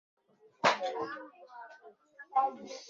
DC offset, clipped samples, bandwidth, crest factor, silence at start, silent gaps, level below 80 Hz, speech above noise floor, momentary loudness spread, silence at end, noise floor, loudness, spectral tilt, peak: under 0.1%; under 0.1%; 7.6 kHz; 24 dB; 0.65 s; none; -84 dBFS; 22 dB; 21 LU; 0 s; -57 dBFS; -32 LUFS; -0.5 dB/octave; -12 dBFS